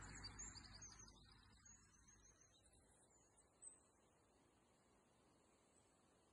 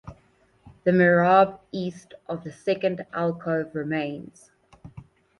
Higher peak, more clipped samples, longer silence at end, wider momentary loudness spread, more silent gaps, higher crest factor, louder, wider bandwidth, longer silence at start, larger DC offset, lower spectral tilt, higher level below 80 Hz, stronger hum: second, -46 dBFS vs -6 dBFS; neither; second, 0 s vs 0.4 s; second, 14 LU vs 17 LU; neither; about the same, 20 dB vs 20 dB; second, -61 LUFS vs -24 LUFS; about the same, 11 kHz vs 11 kHz; about the same, 0 s vs 0.05 s; neither; second, -2 dB/octave vs -7.5 dB/octave; second, -74 dBFS vs -60 dBFS; neither